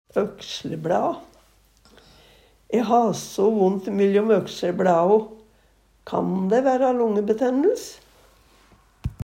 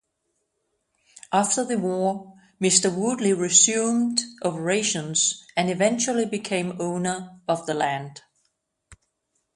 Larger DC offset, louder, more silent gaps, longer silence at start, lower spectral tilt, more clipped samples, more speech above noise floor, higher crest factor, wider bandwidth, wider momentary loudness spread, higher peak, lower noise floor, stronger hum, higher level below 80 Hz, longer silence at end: neither; about the same, -22 LUFS vs -22 LUFS; neither; second, 0.15 s vs 1.3 s; first, -6.5 dB/octave vs -3 dB/octave; neither; second, 38 dB vs 52 dB; about the same, 18 dB vs 22 dB; first, 16 kHz vs 11.5 kHz; about the same, 12 LU vs 10 LU; about the same, -4 dBFS vs -2 dBFS; second, -59 dBFS vs -75 dBFS; neither; first, -52 dBFS vs -66 dBFS; second, 0.1 s vs 0.6 s